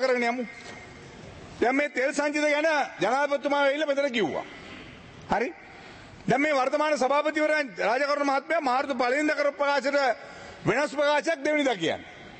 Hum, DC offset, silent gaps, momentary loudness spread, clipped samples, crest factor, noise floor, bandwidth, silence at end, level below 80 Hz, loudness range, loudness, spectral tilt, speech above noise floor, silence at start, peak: none; under 0.1%; none; 19 LU; under 0.1%; 16 dB; -46 dBFS; 8.8 kHz; 0 s; -62 dBFS; 3 LU; -26 LUFS; -4 dB/octave; 21 dB; 0 s; -10 dBFS